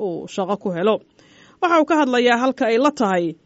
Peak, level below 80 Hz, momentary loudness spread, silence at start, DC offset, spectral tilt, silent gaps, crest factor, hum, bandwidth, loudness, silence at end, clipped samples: -4 dBFS; -68 dBFS; 9 LU; 0 s; under 0.1%; -3.5 dB/octave; none; 16 dB; none; 8 kHz; -19 LUFS; 0.1 s; under 0.1%